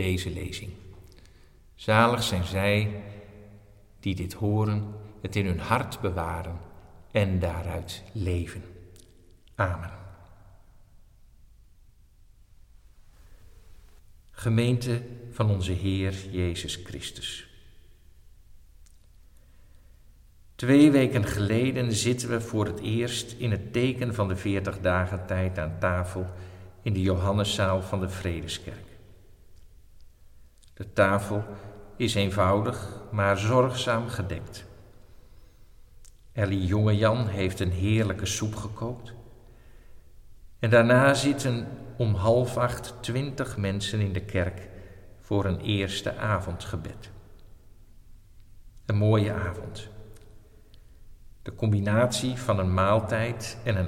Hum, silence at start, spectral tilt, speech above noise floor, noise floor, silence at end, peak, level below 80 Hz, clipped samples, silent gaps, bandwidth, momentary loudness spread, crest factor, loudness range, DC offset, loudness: none; 0 s; -6 dB/octave; 29 dB; -55 dBFS; 0 s; -6 dBFS; -48 dBFS; under 0.1%; none; 16 kHz; 16 LU; 22 dB; 9 LU; under 0.1%; -27 LUFS